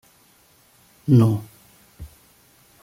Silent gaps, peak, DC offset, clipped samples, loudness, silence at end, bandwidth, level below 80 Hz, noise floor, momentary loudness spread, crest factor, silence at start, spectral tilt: none; -6 dBFS; under 0.1%; under 0.1%; -19 LUFS; 0.75 s; 15.5 kHz; -54 dBFS; -57 dBFS; 27 LU; 20 dB; 1.05 s; -9 dB/octave